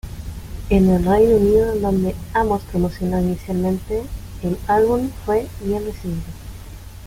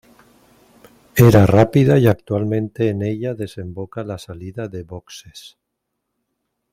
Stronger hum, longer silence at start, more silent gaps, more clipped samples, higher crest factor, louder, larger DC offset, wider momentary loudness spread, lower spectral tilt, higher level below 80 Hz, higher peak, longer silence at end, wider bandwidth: neither; second, 0.05 s vs 1.15 s; neither; neither; about the same, 16 dB vs 18 dB; second, -19 LUFS vs -16 LUFS; neither; about the same, 19 LU vs 20 LU; about the same, -8 dB/octave vs -7.5 dB/octave; first, -32 dBFS vs -46 dBFS; second, -4 dBFS vs 0 dBFS; second, 0 s vs 1.25 s; about the same, 16.5 kHz vs 16 kHz